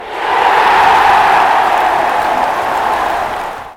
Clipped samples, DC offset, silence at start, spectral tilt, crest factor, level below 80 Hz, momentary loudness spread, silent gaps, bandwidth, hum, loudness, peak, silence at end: under 0.1%; under 0.1%; 0 s; -3 dB/octave; 12 dB; -42 dBFS; 8 LU; none; 17.5 kHz; none; -11 LUFS; 0 dBFS; 0.05 s